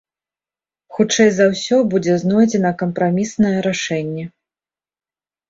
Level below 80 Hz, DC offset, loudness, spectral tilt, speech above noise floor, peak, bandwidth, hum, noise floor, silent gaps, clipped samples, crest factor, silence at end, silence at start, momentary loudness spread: -56 dBFS; under 0.1%; -17 LUFS; -5 dB/octave; over 74 dB; -2 dBFS; 7.8 kHz; none; under -90 dBFS; none; under 0.1%; 16 dB; 1.2 s; 0.9 s; 11 LU